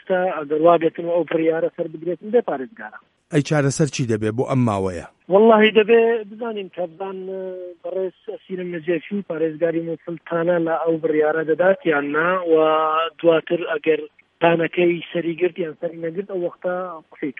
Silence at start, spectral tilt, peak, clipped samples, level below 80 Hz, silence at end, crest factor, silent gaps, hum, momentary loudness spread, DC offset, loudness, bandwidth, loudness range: 0.1 s; -6 dB/octave; 0 dBFS; under 0.1%; -62 dBFS; 0.1 s; 20 dB; none; none; 14 LU; under 0.1%; -20 LUFS; 11 kHz; 8 LU